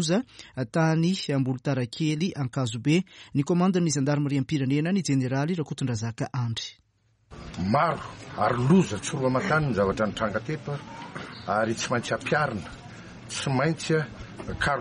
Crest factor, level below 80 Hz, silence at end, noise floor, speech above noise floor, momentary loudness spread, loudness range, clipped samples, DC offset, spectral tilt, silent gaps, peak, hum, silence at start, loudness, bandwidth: 16 dB; -52 dBFS; 0 s; -62 dBFS; 36 dB; 14 LU; 4 LU; under 0.1%; under 0.1%; -5.5 dB/octave; none; -10 dBFS; none; 0 s; -26 LUFS; 11.5 kHz